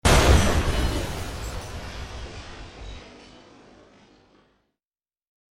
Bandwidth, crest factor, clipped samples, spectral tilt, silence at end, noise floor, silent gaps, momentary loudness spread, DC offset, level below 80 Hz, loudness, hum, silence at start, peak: 16 kHz; 22 dB; under 0.1%; -4.5 dB/octave; 2.4 s; under -90 dBFS; none; 24 LU; under 0.1%; -30 dBFS; -24 LUFS; none; 0.05 s; -4 dBFS